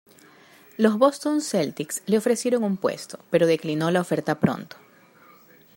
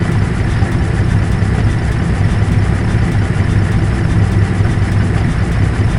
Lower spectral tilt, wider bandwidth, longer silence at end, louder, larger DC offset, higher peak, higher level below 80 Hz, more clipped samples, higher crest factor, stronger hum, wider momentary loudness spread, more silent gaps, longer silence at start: second, -5.5 dB/octave vs -7.5 dB/octave; first, 16 kHz vs 11.5 kHz; first, 1.1 s vs 0 s; second, -23 LUFS vs -14 LUFS; second, under 0.1% vs 0.3%; about the same, -4 dBFS vs -2 dBFS; second, -68 dBFS vs -20 dBFS; neither; first, 20 dB vs 12 dB; neither; first, 9 LU vs 2 LU; neither; first, 0.8 s vs 0 s